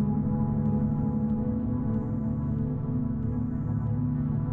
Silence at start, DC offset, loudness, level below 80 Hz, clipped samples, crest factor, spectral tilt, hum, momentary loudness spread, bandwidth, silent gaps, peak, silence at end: 0 s; under 0.1%; -29 LUFS; -40 dBFS; under 0.1%; 10 dB; -13.5 dB/octave; none; 3 LU; 2.4 kHz; none; -16 dBFS; 0 s